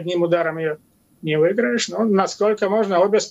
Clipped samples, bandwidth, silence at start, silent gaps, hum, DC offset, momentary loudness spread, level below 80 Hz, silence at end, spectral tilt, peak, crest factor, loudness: under 0.1%; 10.5 kHz; 0 s; none; none; under 0.1%; 9 LU; -68 dBFS; 0 s; -5 dB/octave; -4 dBFS; 14 dB; -19 LUFS